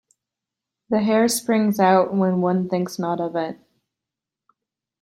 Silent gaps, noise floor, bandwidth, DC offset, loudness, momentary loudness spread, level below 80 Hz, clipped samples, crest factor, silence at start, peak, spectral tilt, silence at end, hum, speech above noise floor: none; -87 dBFS; 16 kHz; under 0.1%; -20 LUFS; 8 LU; -66 dBFS; under 0.1%; 18 dB; 0.9 s; -4 dBFS; -5.5 dB/octave; 1.45 s; none; 67 dB